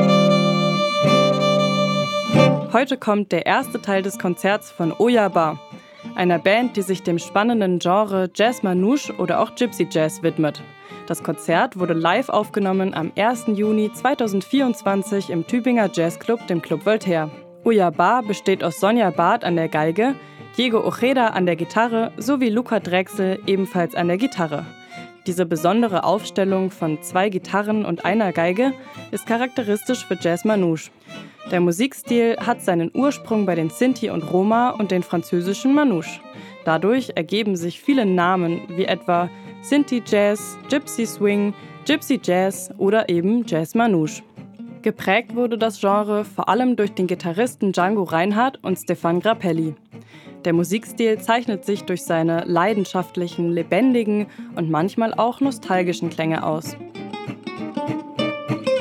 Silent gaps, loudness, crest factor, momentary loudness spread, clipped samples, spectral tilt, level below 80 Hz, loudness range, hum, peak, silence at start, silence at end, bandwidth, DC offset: none; -20 LUFS; 20 dB; 8 LU; under 0.1%; -5.5 dB/octave; -70 dBFS; 3 LU; none; 0 dBFS; 0 s; 0 s; 16 kHz; under 0.1%